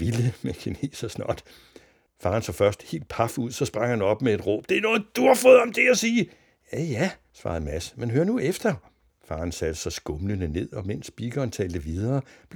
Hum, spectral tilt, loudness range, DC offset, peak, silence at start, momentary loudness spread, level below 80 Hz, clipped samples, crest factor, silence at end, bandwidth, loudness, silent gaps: none; -5.5 dB/octave; 9 LU; under 0.1%; -4 dBFS; 0 s; 13 LU; -46 dBFS; under 0.1%; 22 dB; 0 s; over 20 kHz; -25 LUFS; none